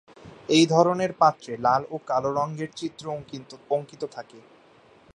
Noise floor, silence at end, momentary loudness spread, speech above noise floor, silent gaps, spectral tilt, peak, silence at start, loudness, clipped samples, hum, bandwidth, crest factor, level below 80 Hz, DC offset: -55 dBFS; 0.75 s; 16 LU; 31 dB; none; -5 dB/octave; -4 dBFS; 0.25 s; -24 LUFS; under 0.1%; none; 11 kHz; 22 dB; -66 dBFS; under 0.1%